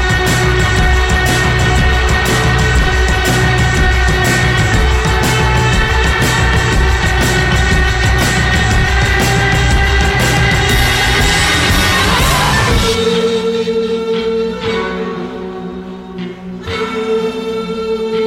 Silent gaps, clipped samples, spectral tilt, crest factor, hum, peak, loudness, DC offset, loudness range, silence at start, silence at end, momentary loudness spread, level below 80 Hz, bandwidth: none; under 0.1%; -4.5 dB/octave; 12 dB; none; 0 dBFS; -12 LUFS; under 0.1%; 8 LU; 0 s; 0 s; 9 LU; -18 dBFS; 17 kHz